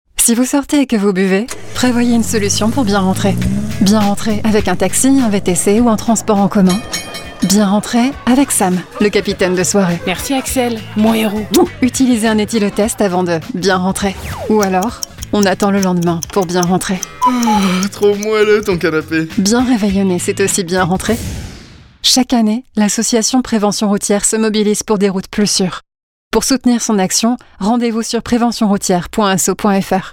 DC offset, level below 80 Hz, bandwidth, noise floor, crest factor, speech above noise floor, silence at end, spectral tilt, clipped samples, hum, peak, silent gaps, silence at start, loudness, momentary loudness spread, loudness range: under 0.1%; -36 dBFS; 18 kHz; -37 dBFS; 12 dB; 24 dB; 0 s; -4.5 dB/octave; under 0.1%; none; 0 dBFS; 26.03-26.31 s; 0.15 s; -13 LUFS; 6 LU; 2 LU